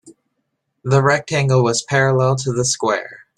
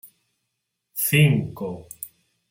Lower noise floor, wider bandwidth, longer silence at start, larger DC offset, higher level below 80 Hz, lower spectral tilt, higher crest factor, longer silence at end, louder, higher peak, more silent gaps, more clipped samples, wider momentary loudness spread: second, -73 dBFS vs -79 dBFS; second, 11.5 kHz vs 16.5 kHz; about the same, 0.05 s vs 0.05 s; neither; about the same, -54 dBFS vs -58 dBFS; about the same, -4.5 dB/octave vs -5 dB/octave; about the same, 16 dB vs 20 dB; second, 0.2 s vs 0.45 s; first, -17 LUFS vs -21 LUFS; first, -2 dBFS vs -6 dBFS; neither; neither; second, 5 LU vs 20 LU